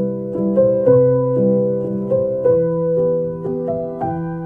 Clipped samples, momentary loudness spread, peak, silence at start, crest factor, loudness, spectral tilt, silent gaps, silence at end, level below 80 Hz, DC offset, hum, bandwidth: under 0.1%; 10 LU; -2 dBFS; 0 s; 14 dB; -17 LUFS; -13 dB/octave; none; 0 s; -50 dBFS; under 0.1%; none; 2.1 kHz